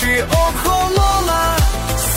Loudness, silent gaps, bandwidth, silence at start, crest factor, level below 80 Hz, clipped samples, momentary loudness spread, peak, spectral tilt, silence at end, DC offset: -16 LUFS; none; 16.5 kHz; 0 s; 12 dB; -20 dBFS; under 0.1%; 3 LU; -2 dBFS; -4 dB/octave; 0 s; under 0.1%